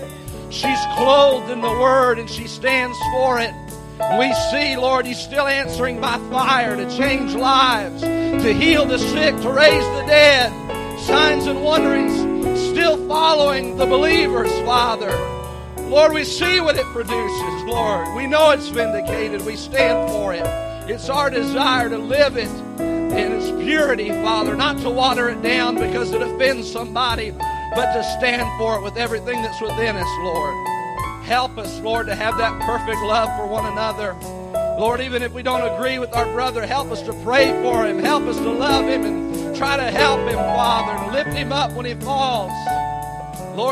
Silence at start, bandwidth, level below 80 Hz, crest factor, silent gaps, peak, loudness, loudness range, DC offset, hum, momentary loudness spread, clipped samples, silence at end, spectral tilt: 0 s; 15.5 kHz; -38 dBFS; 18 dB; none; 0 dBFS; -18 LUFS; 7 LU; under 0.1%; none; 10 LU; under 0.1%; 0 s; -4.5 dB/octave